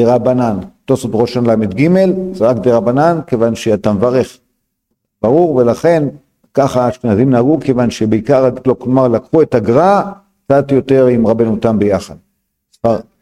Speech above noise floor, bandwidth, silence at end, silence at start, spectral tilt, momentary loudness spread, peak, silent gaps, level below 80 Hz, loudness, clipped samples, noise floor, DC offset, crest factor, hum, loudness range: 58 dB; 13.5 kHz; 0.2 s; 0 s; -7.5 dB/octave; 6 LU; 0 dBFS; none; -44 dBFS; -13 LUFS; under 0.1%; -69 dBFS; under 0.1%; 12 dB; none; 2 LU